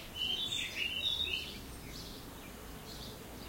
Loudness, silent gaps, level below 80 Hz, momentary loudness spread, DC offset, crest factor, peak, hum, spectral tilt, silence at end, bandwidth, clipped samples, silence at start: -37 LUFS; none; -54 dBFS; 15 LU; under 0.1%; 18 dB; -22 dBFS; none; -2 dB/octave; 0 s; 16.5 kHz; under 0.1%; 0 s